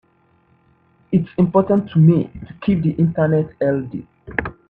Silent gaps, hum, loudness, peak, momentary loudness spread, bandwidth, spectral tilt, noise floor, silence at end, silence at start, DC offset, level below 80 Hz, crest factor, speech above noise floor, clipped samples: none; none; -18 LUFS; -2 dBFS; 12 LU; 4.2 kHz; -11.5 dB/octave; -58 dBFS; 0.15 s; 1.1 s; under 0.1%; -48 dBFS; 18 dB; 41 dB; under 0.1%